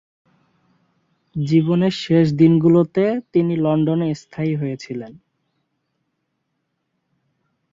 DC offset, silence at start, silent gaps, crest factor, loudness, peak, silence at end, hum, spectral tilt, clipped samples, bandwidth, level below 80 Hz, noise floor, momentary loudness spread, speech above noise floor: under 0.1%; 1.35 s; none; 18 dB; -18 LUFS; -2 dBFS; 2.6 s; none; -8.5 dB/octave; under 0.1%; 7.6 kHz; -58 dBFS; -74 dBFS; 15 LU; 56 dB